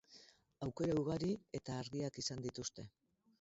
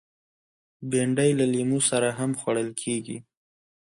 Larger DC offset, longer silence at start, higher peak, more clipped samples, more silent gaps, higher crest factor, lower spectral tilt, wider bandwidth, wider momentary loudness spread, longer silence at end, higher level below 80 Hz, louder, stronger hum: neither; second, 0.1 s vs 0.8 s; second, -28 dBFS vs -8 dBFS; neither; neither; about the same, 16 dB vs 18 dB; first, -6 dB/octave vs -4.5 dB/octave; second, 7.6 kHz vs 11.5 kHz; first, 19 LU vs 12 LU; second, 0.5 s vs 0.75 s; about the same, -68 dBFS vs -66 dBFS; second, -42 LUFS vs -25 LUFS; neither